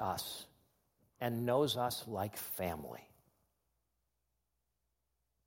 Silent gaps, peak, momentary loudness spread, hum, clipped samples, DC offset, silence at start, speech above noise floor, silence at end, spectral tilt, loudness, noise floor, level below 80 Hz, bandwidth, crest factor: none; -20 dBFS; 17 LU; none; under 0.1%; under 0.1%; 0 s; 48 dB; 2.4 s; -4.5 dB/octave; -38 LUFS; -85 dBFS; -74 dBFS; 16.5 kHz; 20 dB